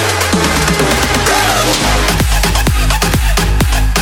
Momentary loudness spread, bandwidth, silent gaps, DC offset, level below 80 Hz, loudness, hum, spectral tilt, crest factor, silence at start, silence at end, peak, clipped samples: 2 LU; 18.5 kHz; none; under 0.1%; -16 dBFS; -12 LUFS; none; -3.5 dB/octave; 10 dB; 0 s; 0 s; 0 dBFS; under 0.1%